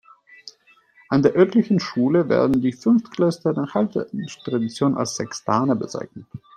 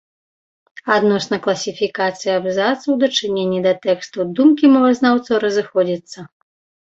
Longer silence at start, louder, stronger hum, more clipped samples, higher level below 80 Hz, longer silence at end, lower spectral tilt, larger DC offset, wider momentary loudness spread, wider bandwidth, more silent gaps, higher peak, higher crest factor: second, 0.45 s vs 0.85 s; second, -21 LUFS vs -17 LUFS; neither; neither; about the same, -60 dBFS vs -62 dBFS; second, 0.2 s vs 0.6 s; first, -6.5 dB/octave vs -5 dB/octave; neither; first, 12 LU vs 9 LU; first, 9.8 kHz vs 8 kHz; neither; about the same, -4 dBFS vs -2 dBFS; about the same, 18 dB vs 16 dB